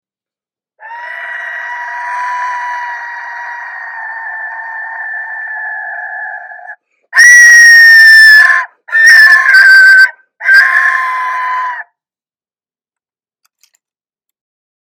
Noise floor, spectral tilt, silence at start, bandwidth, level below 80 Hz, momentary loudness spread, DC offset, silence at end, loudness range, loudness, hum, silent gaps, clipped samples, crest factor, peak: under -90 dBFS; 4.5 dB/octave; 0.85 s; over 20 kHz; -64 dBFS; 22 LU; under 0.1%; 3.1 s; 19 LU; -3 LUFS; none; none; 1%; 10 dB; 0 dBFS